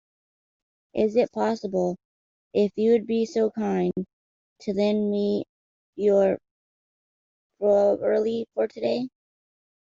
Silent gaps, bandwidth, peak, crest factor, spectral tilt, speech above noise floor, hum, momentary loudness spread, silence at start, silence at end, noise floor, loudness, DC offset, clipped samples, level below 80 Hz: 2.05-2.51 s, 4.13-4.56 s, 5.49-5.93 s, 6.51-7.50 s; 7.6 kHz; -10 dBFS; 16 dB; -7 dB/octave; over 67 dB; none; 13 LU; 0.95 s; 0.85 s; under -90 dBFS; -25 LUFS; under 0.1%; under 0.1%; -66 dBFS